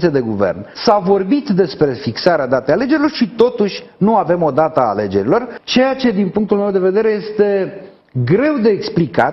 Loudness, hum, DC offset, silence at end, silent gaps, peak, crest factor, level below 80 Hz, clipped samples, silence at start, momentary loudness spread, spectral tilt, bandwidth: -15 LUFS; none; under 0.1%; 0 s; none; 0 dBFS; 14 dB; -50 dBFS; under 0.1%; 0 s; 4 LU; -7 dB/octave; 6.4 kHz